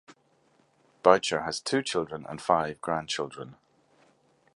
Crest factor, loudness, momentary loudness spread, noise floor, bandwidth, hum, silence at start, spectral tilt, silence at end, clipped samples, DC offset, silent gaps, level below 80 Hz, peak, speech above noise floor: 26 dB; -28 LUFS; 14 LU; -66 dBFS; 11.5 kHz; none; 1.05 s; -3.5 dB/octave; 1.05 s; under 0.1%; under 0.1%; none; -64 dBFS; -4 dBFS; 39 dB